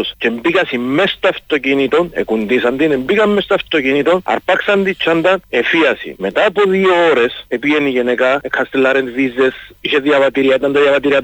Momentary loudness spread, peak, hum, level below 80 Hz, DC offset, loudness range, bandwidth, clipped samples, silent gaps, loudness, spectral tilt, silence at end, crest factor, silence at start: 5 LU; -2 dBFS; none; -50 dBFS; under 0.1%; 1 LU; 19.5 kHz; under 0.1%; none; -14 LUFS; -5.5 dB/octave; 0 s; 12 dB; 0 s